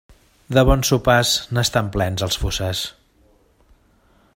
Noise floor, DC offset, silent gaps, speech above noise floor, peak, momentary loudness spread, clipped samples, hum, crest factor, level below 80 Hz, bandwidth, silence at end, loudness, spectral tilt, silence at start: -57 dBFS; under 0.1%; none; 39 dB; 0 dBFS; 8 LU; under 0.1%; none; 20 dB; -32 dBFS; 16.5 kHz; 1.45 s; -19 LUFS; -4 dB/octave; 0.5 s